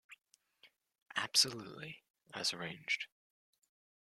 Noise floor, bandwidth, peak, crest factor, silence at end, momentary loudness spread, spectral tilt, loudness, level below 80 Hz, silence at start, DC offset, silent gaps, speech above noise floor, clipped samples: -69 dBFS; 16 kHz; -14 dBFS; 28 dB; 0.95 s; 20 LU; -0.5 dB/octave; -35 LUFS; -82 dBFS; 0.1 s; under 0.1%; 1.02-1.06 s, 2.10-2.14 s; 31 dB; under 0.1%